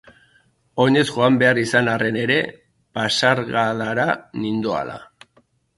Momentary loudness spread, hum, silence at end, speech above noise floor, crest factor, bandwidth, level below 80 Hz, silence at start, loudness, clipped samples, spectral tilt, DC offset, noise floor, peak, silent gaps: 13 LU; none; 0.75 s; 41 dB; 20 dB; 11.5 kHz; -58 dBFS; 0.75 s; -19 LUFS; under 0.1%; -5 dB/octave; under 0.1%; -60 dBFS; 0 dBFS; none